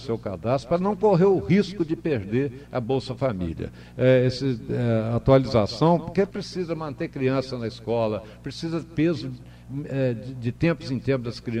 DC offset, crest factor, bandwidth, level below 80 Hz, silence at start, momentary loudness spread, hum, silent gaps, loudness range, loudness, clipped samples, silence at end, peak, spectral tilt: under 0.1%; 18 dB; 10 kHz; -48 dBFS; 0 s; 12 LU; none; none; 5 LU; -24 LUFS; under 0.1%; 0 s; -6 dBFS; -7.5 dB/octave